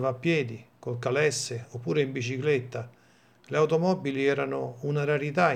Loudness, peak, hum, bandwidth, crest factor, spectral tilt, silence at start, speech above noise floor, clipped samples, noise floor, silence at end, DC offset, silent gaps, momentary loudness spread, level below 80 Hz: -28 LUFS; -8 dBFS; none; 14 kHz; 20 dB; -5.5 dB/octave; 0 s; 32 dB; under 0.1%; -60 dBFS; 0 s; under 0.1%; none; 12 LU; -74 dBFS